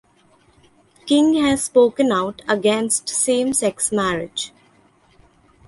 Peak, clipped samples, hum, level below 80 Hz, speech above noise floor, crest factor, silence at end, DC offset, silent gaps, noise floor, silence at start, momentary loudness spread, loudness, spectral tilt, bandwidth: -4 dBFS; under 0.1%; none; -54 dBFS; 38 dB; 16 dB; 1.2 s; under 0.1%; none; -56 dBFS; 1.05 s; 10 LU; -18 LUFS; -3 dB/octave; 12 kHz